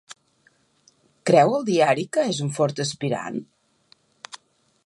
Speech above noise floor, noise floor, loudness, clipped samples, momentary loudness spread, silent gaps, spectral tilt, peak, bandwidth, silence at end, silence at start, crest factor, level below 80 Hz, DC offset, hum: 42 dB; -63 dBFS; -22 LUFS; under 0.1%; 24 LU; none; -5 dB/octave; -2 dBFS; 11.5 kHz; 1.45 s; 1.25 s; 22 dB; -72 dBFS; under 0.1%; none